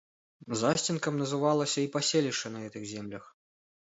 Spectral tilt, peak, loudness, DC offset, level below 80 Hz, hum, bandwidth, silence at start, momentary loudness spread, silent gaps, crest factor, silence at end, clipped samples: -4 dB/octave; -12 dBFS; -30 LUFS; under 0.1%; -72 dBFS; none; 8 kHz; 0.4 s; 12 LU; none; 20 dB; 0.6 s; under 0.1%